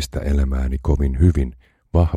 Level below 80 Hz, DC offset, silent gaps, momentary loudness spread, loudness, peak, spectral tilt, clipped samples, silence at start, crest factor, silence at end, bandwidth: -22 dBFS; under 0.1%; none; 6 LU; -20 LUFS; -4 dBFS; -7.5 dB/octave; under 0.1%; 0 s; 16 dB; 0 s; 13 kHz